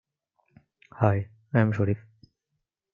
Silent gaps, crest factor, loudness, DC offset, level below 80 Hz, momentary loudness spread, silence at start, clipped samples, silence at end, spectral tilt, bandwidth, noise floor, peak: none; 24 dB; -26 LUFS; under 0.1%; -64 dBFS; 6 LU; 1 s; under 0.1%; 0.95 s; -10 dB/octave; 3.8 kHz; -81 dBFS; -6 dBFS